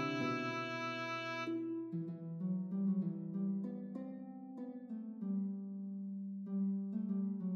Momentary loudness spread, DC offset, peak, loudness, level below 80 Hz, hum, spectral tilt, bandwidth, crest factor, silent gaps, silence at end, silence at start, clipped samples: 9 LU; under 0.1%; -26 dBFS; -41 LUFS; under -90 dBFS; none; -7 dB/octave; 7 kHz; 14 dB; none; 0 s; 0 s; under 0.1%